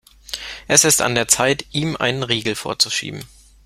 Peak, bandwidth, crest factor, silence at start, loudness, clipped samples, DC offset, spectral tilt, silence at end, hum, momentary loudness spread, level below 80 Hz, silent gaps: 0 dBFS; 16.5 kHz; 20 dB; 0.3 s; -17 LUFS; under 0.1%; under 0.1%; -2 dB/octave; 0.4 s; none; 16 LU; -50 dBFS; none